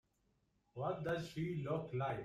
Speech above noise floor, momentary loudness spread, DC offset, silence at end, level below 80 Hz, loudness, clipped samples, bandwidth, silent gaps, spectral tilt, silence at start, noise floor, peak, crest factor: 39 dB; 4 LU; under 0.1%; 0 s; -70 dBFS; -42 LUFS; under 0.1%; 13.5 kHz; none; -7.5 dB/octave; 0.75 s; -79 dBFS; -26 dBFS; 16 dB